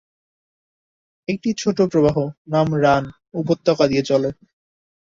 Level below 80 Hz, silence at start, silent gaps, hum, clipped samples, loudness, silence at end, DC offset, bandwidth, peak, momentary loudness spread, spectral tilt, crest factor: -52 dBFS; 1.3 s; 2.38-2.45 s; none; under 0.1%; -19 LUFS; 0.8 s; under 0.1%; 7.8 kHz; -2 dBFS; 11 LU; -6.5 dB/octave; 18 dB